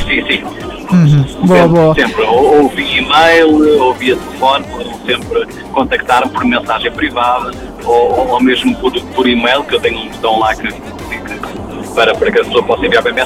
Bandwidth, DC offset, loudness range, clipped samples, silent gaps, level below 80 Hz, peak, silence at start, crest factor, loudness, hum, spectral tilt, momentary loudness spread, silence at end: 15.5 kHz; under 0.1%; 5 LU; under 0.1%; none; -34 dBFS; 0 dBFS; 0 s; 12 dB; -11 LUFS; none; -6 dB/octave; 14 LU; 0 s